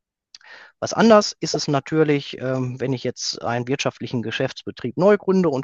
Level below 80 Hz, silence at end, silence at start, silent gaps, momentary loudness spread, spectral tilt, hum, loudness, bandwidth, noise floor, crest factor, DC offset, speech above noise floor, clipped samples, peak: -62 dBFS; 0 s; 0.5 s; none; 11 LU; -5 dB/octave; none; -21 LUFS; 8 kHz; -50 dBFS; 20 dB; under 0.1%; 30 dB; under 0.1%; 0 dBFS